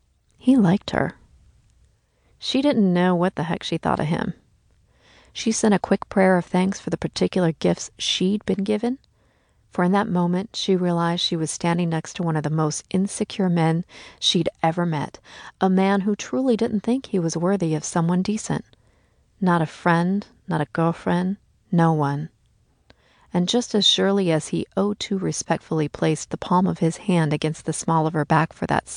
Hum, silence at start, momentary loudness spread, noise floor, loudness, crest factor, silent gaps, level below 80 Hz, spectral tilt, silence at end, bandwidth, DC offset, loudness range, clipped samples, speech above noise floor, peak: none; 0.45 s; 9 LU; -62 dBFS; -22 LUFS; 18 dB; none; -54 dBFS; -5.5 dB/octave; 0 s; 10.5 kHz; under 0.1%; 2 LU; under 0.1%; 40 dB; -4 dBFS